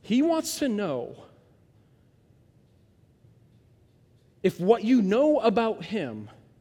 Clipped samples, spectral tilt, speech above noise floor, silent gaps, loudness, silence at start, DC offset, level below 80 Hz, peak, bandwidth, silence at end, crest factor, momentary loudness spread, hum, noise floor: under 0.1%; -5.5 dB/octave; 36 dB; none; -25 LUFS; 0.05 s; under 0.1%; -66 dBFS; -8 dBFS; 17 kHz; 0.3 s; 20 dB; 14 LU; none; -60 dBFS